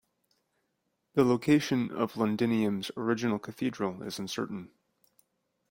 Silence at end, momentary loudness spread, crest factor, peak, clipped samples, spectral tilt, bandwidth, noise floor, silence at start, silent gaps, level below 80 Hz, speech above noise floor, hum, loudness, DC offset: 1.05 s; 10 LU; 20 dB; -10 dBFS; under 0.1%; -6 dB/octave; 16.5 kHz; -79 dBFS; 1.15 s; none; -70 dBFS; 50 dB; none; -30 LUFS; under 0.1%